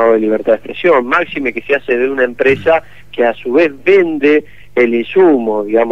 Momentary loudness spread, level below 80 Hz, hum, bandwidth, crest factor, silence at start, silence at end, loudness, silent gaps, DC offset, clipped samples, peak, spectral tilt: 5 LU; -50 dBFS; 50 Hz at -45 dBFS; 6.8 kHz; 12 dB; 0 s; 0 s; -13 LUFS; none; 2%; under 0.1%; 0 dBFS; -7 dB/octave